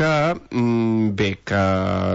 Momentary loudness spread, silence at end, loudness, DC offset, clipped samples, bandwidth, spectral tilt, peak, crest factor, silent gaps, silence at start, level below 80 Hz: 3 LU; 0 s; -20 LUFS; under 0.1%; under 0.1%; 8 kHz; -7 dB/octave; -8 dBFS; 12 dB; none; 0 s; -50 dBFS